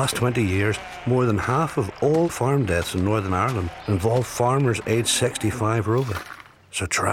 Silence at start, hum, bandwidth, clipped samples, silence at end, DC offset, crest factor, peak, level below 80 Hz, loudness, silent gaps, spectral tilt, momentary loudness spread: 0 s; none; 16.5 kHz; under 0.1%; 0 s; under 0.1%; 16 dB; -6 dBFS; -46 dBFS; -23 LUFS; none; -5 dB/octave; 7 LU